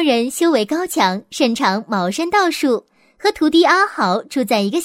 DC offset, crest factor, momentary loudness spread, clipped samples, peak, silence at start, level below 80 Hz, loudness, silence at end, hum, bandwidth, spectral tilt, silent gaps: under 0.1%; 16 dB; 6 LU; under 0.1%; -2 dBFS; 0 s; -58 dBFS; -17 LUFS; 0 s; none; 16 kHz; -4 dB/octave; none